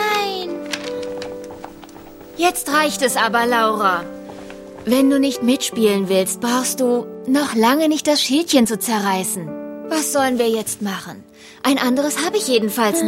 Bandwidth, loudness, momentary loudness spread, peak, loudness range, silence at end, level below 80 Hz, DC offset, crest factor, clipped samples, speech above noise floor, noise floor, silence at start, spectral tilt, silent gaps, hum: 16.5 kHz; -18 LUFS; 16 LU; -2 dBFS; 3 LU; 0 s; -56 dBFS; under 0.1%; 18 dB; under 0.1%; 21 dB; -39 dBFS; 0 s; -3 dB/octave; none; none